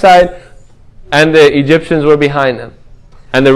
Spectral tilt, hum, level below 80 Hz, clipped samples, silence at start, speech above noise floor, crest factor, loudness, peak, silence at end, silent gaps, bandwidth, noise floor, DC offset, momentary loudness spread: -5.5 dB/octave; none; -36 dBFS; 1%; 0 s; 29 dB; 10 dB; -9 LUFS; 0 dBFS; 0 s; none; 12.5 kHz; -37 dBFS; under 0.1%; 9 LU